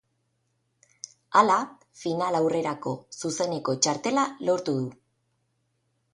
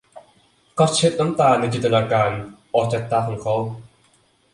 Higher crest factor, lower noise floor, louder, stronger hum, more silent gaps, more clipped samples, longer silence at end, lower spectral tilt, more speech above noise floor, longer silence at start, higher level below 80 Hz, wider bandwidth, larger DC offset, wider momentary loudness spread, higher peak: first, 24 dB vs 18 dB; first, -74 dBFS vs -59 dBFS; second, -26 LUFS vs -20 LUFS; neither; neither; neither; first, 1.2 s vs 0.7 s; about the same, -4 dB/octave vs -5 dB/octave; first, 49 dB vs 40 dB; first, 1.3 s vs 0.15 s; second, -72 dBFS vs -54 dBFS; about the same, 11.5 kHz vs 11.5 kHz; neither; first, 15 LU vs 12 LU; about the same, -4 dBFS vs -2 dBFS